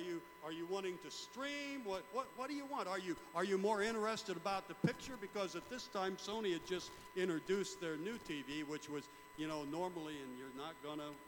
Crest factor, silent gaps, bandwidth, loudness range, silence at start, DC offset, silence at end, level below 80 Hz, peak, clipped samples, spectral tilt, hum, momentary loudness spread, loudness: 20 dB; none; 19 kHz; 4 LU; 0 s; under 0.1%; 0 s; -74 dBFS; -22 dBFS; under 0.1%; -4.5 dB/octave; 60 Hz at -75 dBFS; 10 LU; -43 LUFS